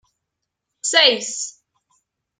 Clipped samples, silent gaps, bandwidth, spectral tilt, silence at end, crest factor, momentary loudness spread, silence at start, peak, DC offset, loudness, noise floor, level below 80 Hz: under 0.1%; none; 9.8 kHz; 1 dB/octave; 0.9 s; 22 dB; 15 LU; 0.85 s; 0 dBFS; under 0.1%; -17 LUFS; -80 dBFS; -80 dBFS